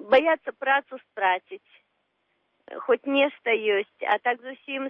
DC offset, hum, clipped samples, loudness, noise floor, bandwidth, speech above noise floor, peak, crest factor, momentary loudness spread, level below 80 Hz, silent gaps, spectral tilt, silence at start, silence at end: under 0.1%; none; under 0.1%; -25 LUFS; -73 dBFS; 5.6 kHz; 48 dB; -8 dBFS; 18 dB; 16 LU; -74 dBFS; none; -5 dB/octave; 0 s; 0 s